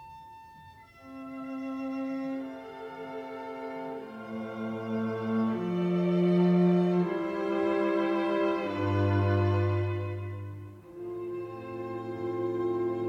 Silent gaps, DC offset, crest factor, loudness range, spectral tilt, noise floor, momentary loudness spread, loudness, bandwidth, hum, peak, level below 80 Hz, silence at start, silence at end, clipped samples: none; under 0.1%; 16 dB; 11 LU; -9 dB/octave; -52 dBFS; 16 LU; -30 LUFS; 6.8 kHz; none; -14 dBFS; -68 dBFS; 0 s; 0 s; under 0.1%